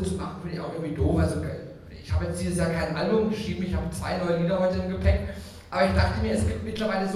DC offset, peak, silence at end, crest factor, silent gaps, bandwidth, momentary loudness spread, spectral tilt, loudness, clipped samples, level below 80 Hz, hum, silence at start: under 0.1%; -8 dBFS; 0 s; 18 dB; none; 13 kHz; 10 LU; -6.5 dB/octave; -27 LUFS; under 0.1%; -36 dBFS; none; 0 s